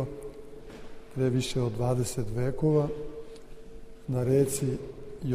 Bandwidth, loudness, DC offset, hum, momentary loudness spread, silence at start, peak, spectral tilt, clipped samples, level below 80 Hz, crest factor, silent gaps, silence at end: 15.5 kHz; -29 LUFS; under 0.1%; none; 22 LU; 0 s; -14 dBFS; -6.5 dB/octave; under 0.1%; -46 dBFS; 16 dB; none; 0 s